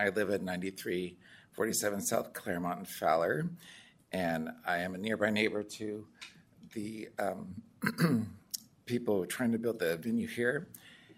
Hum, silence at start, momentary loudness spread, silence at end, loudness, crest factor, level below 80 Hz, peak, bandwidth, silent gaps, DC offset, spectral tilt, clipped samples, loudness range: none; 0 s; 14 LU; 0.05 s; -34 LUFS; 22 dB; -72 dBFS; -12 dBFS; 16 kHz; none; under 0.1%; -4.5 dB/octave; under 0.1%; 3 LU